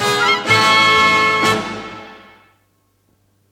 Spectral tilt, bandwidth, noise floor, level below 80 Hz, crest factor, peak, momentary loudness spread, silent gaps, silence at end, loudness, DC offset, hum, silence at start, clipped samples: -2.5 dB/octave; 17.5 kHz; -61 dBFS; -54 dBFS; 16 dB; -2 dBFS; 20 LU; none; 1.35 s; -12 LUFS; under 0.1%; none; 0 s; under 0.1%